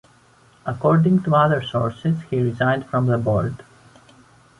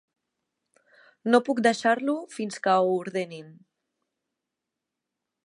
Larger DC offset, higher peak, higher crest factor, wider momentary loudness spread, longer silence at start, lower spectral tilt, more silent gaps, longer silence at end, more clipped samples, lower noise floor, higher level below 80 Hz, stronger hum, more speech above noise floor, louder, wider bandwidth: neither; about the same, -4 dBFS vs -6 dBFS; about the same, 18 dB vs 22 dB; about the same, 11 LU vs 12 LU; second, 0.65 s vs 1.25 s; first, -8.5 dB/octave vs -5 dB/octave; neither; second, 0.95 s vs 1.95 s; neither; second, -54 dBFS vs -86 dBFS; first, -50 dBFS vs -82 dBFS; neither; second, 34 dB vs 61 dB; first, -20 LUFS vs -25 LUFS; about the same, 10.5 kHz vs 11 kHz